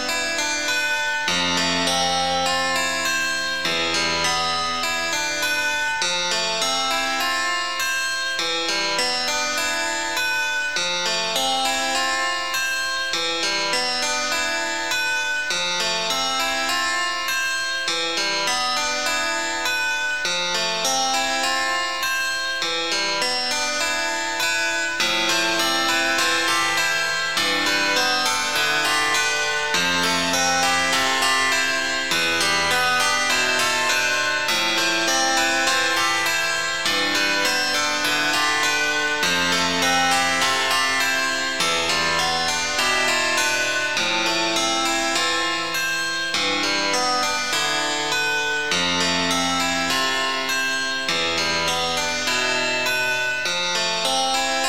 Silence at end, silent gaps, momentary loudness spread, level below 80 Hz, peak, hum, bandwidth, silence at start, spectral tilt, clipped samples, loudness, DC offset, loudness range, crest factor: 0 s; none; 4 LU; -54 dBFS; -8 dBFS; none; 18 kHz; 0 s; -0.5 dB/octave; under 0.1%; -20 LUFS; 1%; 3 LU; 14 dB